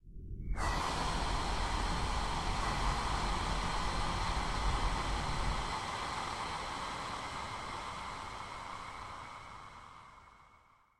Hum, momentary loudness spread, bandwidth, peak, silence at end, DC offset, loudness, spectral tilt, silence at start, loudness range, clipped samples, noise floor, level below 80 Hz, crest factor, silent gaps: none; 13 LU; 13 kHz; -22 dBFS; 0.45 s; under 0.1%; -37 LUFS; -4 dB/octave; 0.05 s; 8 LU; under 0.1%; -65 dBFS; -42 dBFS; 16 dB; none